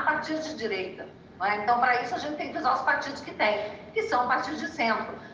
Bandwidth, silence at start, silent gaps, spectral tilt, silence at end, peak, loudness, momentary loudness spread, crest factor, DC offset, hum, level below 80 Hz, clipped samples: 7.8 kHz; 0 s; none; -4 dB/octave; 0 s; -10 dBFS; -28 LUFS; 9 LU; 18 dB; under 0.1%; none; -64 dBFS; under 0.1%